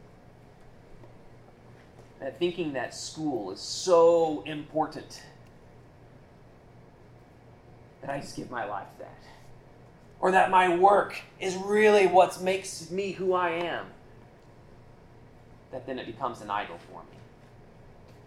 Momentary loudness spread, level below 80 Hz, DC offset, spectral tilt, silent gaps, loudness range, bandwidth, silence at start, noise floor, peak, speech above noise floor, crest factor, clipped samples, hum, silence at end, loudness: 23 LU; -60 dBFS; under 0.1%; -4.5 dB/octave; none; 17 LU; 14.5 kHz; 0.9 s; -53 dBFS; -8 dBFS; 27 dB; 22 dB; under 0.1%; none; 0.4 s; -26 LUFS